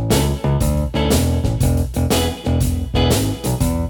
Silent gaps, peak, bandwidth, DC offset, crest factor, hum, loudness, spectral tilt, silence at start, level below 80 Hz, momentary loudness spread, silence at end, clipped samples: none; -4 dBFS; 19.5 kHz; under 0.1%; 14 dB; none; -18 LUFS; -5.5 dB/octave; 0 s; -24 dBFS; 3 LU; 0 s; under 0.1%